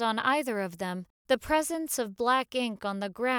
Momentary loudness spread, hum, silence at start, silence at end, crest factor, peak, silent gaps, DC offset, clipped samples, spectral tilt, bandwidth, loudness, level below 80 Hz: 8 LU; none; 0 s; 0 s; 18 dB; -12 dBFS; 1.10-1.25 s; under 0.1%; under 0.1%; -3.5 dB/octave; over 20 kHz; -29 LUFS; -58 dBFS